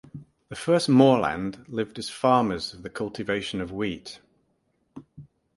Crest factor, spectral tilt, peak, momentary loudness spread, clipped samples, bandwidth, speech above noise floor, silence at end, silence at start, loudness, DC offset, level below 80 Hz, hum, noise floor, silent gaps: 22 dB; -6 dB/octave; -4 dBFS; 16 LU; under 0.1%; 11.5 kHz; 47 dB; 0.3 s; 0.15 s; -25 LUFS; under 0.1%; -56 dBFS; none; -71 dBFS; none